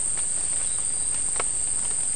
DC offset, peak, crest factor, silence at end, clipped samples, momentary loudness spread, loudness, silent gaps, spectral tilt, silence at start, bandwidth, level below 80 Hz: 2%; -8 dBFS; 18 dB; 0 s; under 0.1%; 0 LU; -23 LUFS; none; 0 dB/octave; 0 s; 12 kHz; -48 dBFS